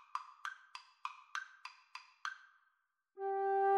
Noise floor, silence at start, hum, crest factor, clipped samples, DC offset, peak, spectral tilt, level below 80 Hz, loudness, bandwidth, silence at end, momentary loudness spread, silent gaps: -81 dBFS; 0.15 s; none; 18 dB; under 0.1%; under 0.1%; -22 dBFS; -0.5 dB/octave; under -90 dBFS; -43 LUFS; 9.6 kHz; 0 s; 18 LU; none